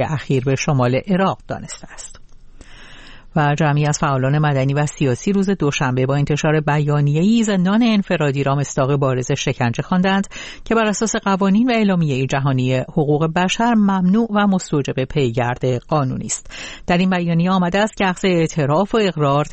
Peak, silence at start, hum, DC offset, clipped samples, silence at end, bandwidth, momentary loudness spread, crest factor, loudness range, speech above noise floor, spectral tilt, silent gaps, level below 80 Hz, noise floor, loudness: -4 dBFS; 0 s; none; under 0.1%; under 0.1%; 0 s; 8.8 kHz; 6 LU; 14 dB; 3 LU; 22 dB; -6 dB/octave; none; -42 dBFS; -39 dBFS; -18 LUFS